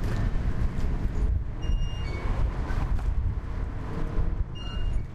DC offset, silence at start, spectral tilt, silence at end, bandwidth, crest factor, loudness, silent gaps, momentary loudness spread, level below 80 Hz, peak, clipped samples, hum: under 0.1%; 0 s; -7.5 dB/octave; 0 s; 7.8 kHz; 12 dB; -32 LUFS; none; 5 LU; -28 dBFS; -14 dBFS; under 0.1%; none